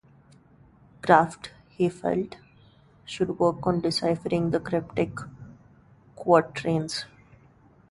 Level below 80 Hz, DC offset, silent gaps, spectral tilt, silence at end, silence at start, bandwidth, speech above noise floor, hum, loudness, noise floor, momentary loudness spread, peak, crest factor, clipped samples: -58 dBFS; under 0.1%; none; -6 dB/octave; 0.85 s; 1.05 s; 11.5 kHz; 32 dB; none; -26 LUFS; -57 dBFS; 19 LU; -2 dBFS; 24 dB; under 0.1%